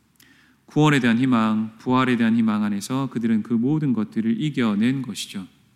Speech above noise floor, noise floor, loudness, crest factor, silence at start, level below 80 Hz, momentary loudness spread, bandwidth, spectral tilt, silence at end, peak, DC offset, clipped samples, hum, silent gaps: 34 dB; -55 dBFS; -21 LUFS; 16 dB; 0.75 s; -66 dBFS; 9 LU; 13.5 kHz; -6 dB/octave; 0.3 s; -6 dBFS; under 0.1%; under 0.1%; none; none